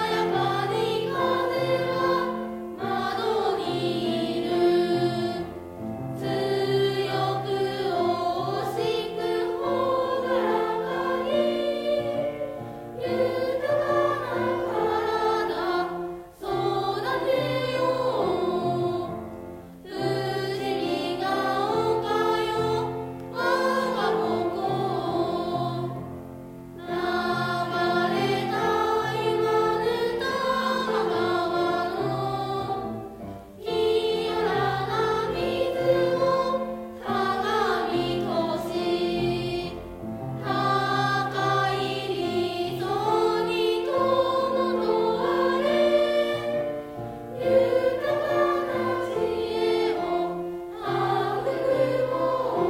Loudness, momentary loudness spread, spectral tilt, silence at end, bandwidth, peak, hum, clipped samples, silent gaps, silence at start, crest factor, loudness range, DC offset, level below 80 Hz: -26 LUFS; 9 LU; -6 dB/octave; 0 s; 16 kHz; -10 dBFS; none; under 0.1%; none; 0 s; 16 dB; 3 LU; under 0.1%; -56 dBFS